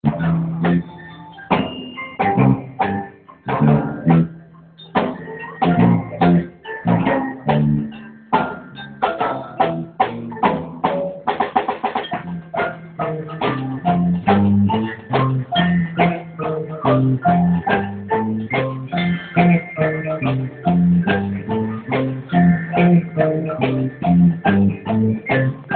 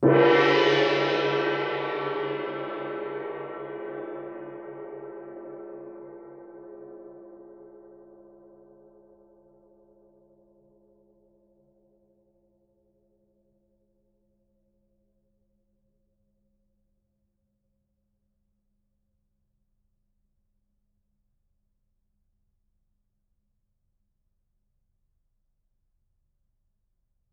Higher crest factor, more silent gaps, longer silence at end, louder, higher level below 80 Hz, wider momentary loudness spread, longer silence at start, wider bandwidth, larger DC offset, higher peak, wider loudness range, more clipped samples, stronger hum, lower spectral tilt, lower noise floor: second, 18 dB vs 26 dB; neither; second, 0 s vs 19.4 s; first, -19 LUFS vs -26 LUFS; first, -44 dBFS vs -72 dBFS; second, 10 LU vs 26 LU; about the same, 0.05 s vs 0 s; second, 4.4 kHz vs 7.2 kHz; neither; first, -2 dBFS vs -8 dBFS; second, 4 LU vs 25 LU; neither; neither; first, -12.5 dB/octave vs -3.5 dB/octave; second, -42 dBFS vs -75 dBFS